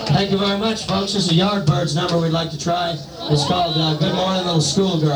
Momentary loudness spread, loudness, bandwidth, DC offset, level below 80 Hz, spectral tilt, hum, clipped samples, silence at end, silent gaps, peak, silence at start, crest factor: 5 LU; -19 LUFS; over 20 kHz; under 0.1%; -46 dBFS; -5 dB/octave; none; under 0.1%; 0 s; none; -4 dBFS; 0 s; 14 dB